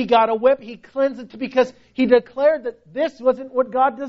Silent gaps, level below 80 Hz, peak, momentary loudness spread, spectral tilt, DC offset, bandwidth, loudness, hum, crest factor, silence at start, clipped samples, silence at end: none; -60 dBFS; -2 dBFS; 9 LU; -3 dB/octave; under 0.1%; 6.6 kHz; -20 LUFS; none; 18 dB; 0 s; under 0.1%; 0 s